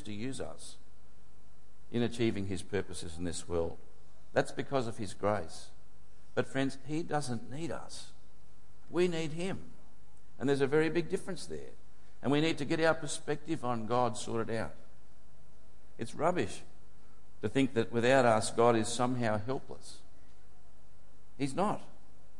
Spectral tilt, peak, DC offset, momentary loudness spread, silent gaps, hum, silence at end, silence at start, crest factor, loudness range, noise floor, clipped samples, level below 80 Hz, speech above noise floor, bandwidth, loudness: -5.5 dB/octave; -14 dBFS; 2%; 16 LU; none; none; 0.55 s; 0 s; 22 dB; 8 LU; -63 dBFS; under 0.1%; -62 dBFS; 30 dB; 11.5 kHz; -34 LUFS